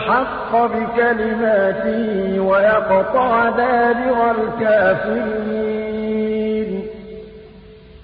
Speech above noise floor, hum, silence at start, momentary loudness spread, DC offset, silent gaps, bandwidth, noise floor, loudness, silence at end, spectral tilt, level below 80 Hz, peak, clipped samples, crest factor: 24 dB; none; 0 s; 8 LU; under 0.1%; none; 5 kHz; -41 dBFS; -17 LUFS; 0 s; -11 dB/octave; -46 dBFS; -4 dBFS; under 0.1%; 14 dB